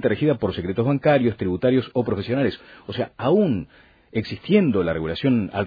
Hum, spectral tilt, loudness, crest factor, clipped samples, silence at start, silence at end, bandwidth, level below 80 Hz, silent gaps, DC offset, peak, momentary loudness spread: none; -9.5 dB/octave; -22 LUFS; 16 dB; under 0.1%; 0 s; 0 s; 5 kHz; -50 dBFS; none; under 0.1%; -6 dBFS; 10 LU